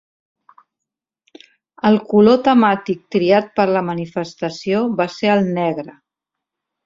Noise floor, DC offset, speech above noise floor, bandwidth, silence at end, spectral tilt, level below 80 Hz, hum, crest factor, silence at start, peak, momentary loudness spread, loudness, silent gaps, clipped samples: -83 dBFS; under 0.1%; 67 dB; 7.6 kHz; 0.95 s; -7 dB/octave; -60 dBFS; none; 16 dB; 1.85 s; -2 dBFS; 12 LU; -17 LUFS; none; under 0.1%